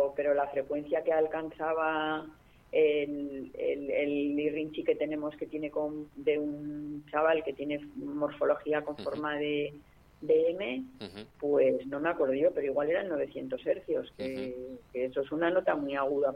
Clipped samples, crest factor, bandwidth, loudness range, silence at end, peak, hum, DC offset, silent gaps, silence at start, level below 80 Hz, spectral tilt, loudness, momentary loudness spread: under 0.1%; 18 dB; 5.6 kHz; 2 LU; 0 s; -14 dBFS; none; under 0.1%; none; 0 s; -64 dBFS; -7 dB/octave; -32 LUFS; 11 LU